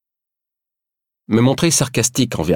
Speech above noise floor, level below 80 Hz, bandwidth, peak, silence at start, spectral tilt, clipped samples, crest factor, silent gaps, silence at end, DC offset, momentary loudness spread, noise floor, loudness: 69 dB; -46 dBFS; 17.5 kHz; -2 dBFS; 1.3 s; -4.5 dB/octave; under 0.1%; 16 dB; none; 0 s; under 0.1%; 5 LU; -85 dBFS; -16 LUFS